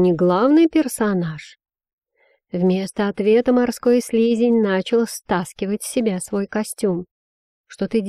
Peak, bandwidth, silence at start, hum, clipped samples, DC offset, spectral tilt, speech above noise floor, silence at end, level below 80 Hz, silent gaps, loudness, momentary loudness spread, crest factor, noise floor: -6 dBFS; 15 kHz; 0 s; none; under 0.1%; under 0.1%; -6 dB/octave; 44 dB; 0 s; -56 dBFS; 1.93-2.02 s, 7.11-7.64 s; -19 LUFS; 10 LU; 12 dB; -63 dBFS